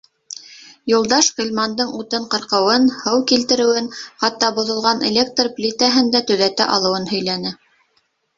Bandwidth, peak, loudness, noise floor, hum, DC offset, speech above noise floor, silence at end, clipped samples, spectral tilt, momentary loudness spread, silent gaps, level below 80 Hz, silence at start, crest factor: 7.8 kHz; 0 dBFS; -17 LUFS; -65 dBFS; none; under 0.1%; 47 dB; 0.85 s; under 0.1%; -2.5 dB/octave; 9 LU; none; -60 dBFS; 0.3 s; 18 dB